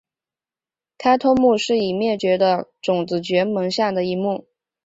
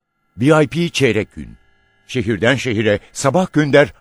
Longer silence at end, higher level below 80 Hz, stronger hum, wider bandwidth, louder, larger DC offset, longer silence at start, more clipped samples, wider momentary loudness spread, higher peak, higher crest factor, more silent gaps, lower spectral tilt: first, 0.45 s vs 0.1 s; second, -58 dBFS vs -48 dBFS; neither; second, 8 kHz vs 12.5 kHz; second, -19 LUFS vs -16 LUFS; neither; first, 1 s vs 0.35 s; neither; about the same, 7 LU vs 9 LU; second, -4 dBFS vs 0 dBFS; about the same, 16 dB vs 16 dB; neither; about the same, -5.5 dB/octave vs -5.5 dB/octave